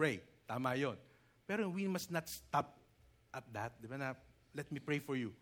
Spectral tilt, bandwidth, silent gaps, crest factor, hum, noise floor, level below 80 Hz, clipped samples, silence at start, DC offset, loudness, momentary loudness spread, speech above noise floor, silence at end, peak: -5.5 dB/octave; over 20 kHz; none; 22 dB; none; -69 dBFS; -74 dBFS; under 0.1%; 0 s; under 0.1%; -42 LUFS; 14 LU; 29 dB; 0.05 s; -20 dBFS